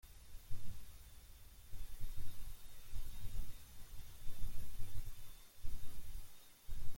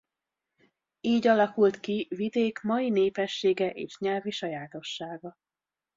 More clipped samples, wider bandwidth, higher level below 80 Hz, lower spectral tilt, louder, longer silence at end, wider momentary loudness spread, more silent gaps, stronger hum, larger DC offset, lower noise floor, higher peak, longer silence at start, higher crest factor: neither; first, 16.5 kHz vs 7.6 kHz; first, -48 dBFS vs -72 dBFS; second, -4 dB/octave vs -5.5 dB/octave; second, -55 LUFS vs -28 LUFS; second, 0 s vs 0.65 s; second, 8 LU vs 14 LU; neither; neither; neither; second, -57 dBFS vs under -90 dBFS; second, -24 dBFS vs -12 dBFS; second, 0.1 s vs 1.05 s; about the same, 14 dB vs 18 dB